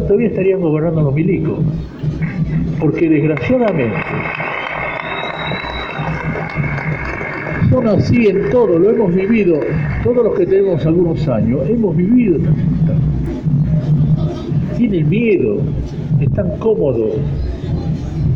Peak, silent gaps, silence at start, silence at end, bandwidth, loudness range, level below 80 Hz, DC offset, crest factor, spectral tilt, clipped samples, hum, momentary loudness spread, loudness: -4 dBFS; none; 0 s; 0 s; 6.6 kHz; 5 LU; -30 dBFS; under 0.1%; 10 dB; -9.5 dB/octave; under 0.1%; none; 8 LU; -15 LUFS